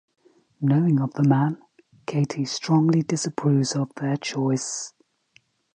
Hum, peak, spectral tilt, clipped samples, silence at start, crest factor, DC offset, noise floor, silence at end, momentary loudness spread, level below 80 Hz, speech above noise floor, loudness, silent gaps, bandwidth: none; -8 dBFS; -6 dB/octave; under 0.1%; 0.6 s; 16 dB; under 0.1%; -61 dBFS; 0.85 s; 10 LU; -70 dBFS; 39 dB; -23 LUFS; none; 9.8 kHz